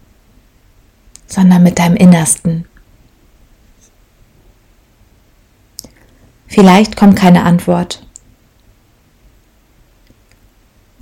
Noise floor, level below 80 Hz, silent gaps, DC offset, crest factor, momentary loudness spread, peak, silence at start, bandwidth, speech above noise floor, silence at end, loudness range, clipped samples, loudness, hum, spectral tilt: -50 dBFS; -42 dBFS; none; under 0.1%; 14 dB; 22 LU; 0 dBFS; 1.3 s; 15 kHz; 42 dB; 3.05 s; 10 LU; 1%; -9 LUFS; none; -6 dB/octave